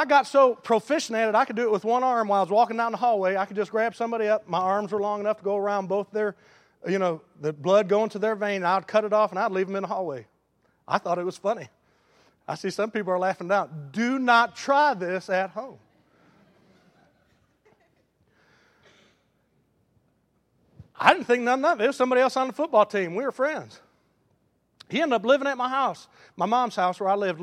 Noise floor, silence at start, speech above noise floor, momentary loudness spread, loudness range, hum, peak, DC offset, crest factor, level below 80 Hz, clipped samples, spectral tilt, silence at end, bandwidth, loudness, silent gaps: -69 dBFS; 0 s; 45 dB; 9 LU; 6 LU; none; 0 dBFS; under 0.1%; 26 dB; -76 dBFS; under 0.1%; -5 dB/octave; 0 s; 13 kHz; -24 LUFS; none